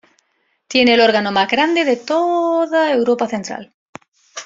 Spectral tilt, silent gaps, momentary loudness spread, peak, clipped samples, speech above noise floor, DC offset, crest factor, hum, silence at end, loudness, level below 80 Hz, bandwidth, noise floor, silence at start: -4 dB/octave; 3.74-3.93 s, 4.08-4.12 s; 12 LU; -2 dBFS; under 0.1%; 50 dB; under 0.1%; 16 dB; none; 0 s; -15 LUFS; -60 dBFS; 7.8 kHz; -65 dBFS; 0.7 s